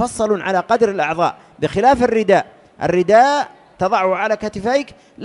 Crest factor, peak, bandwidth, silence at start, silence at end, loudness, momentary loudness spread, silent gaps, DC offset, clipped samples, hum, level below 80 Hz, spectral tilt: 16 dB; -2 dBFS; 11.5 kHz; 0 s; 0 s; -17 LUFS; 11 LU; none; under 0.1%; under 0.1%; none; -48 dBFS; -5 dB/octave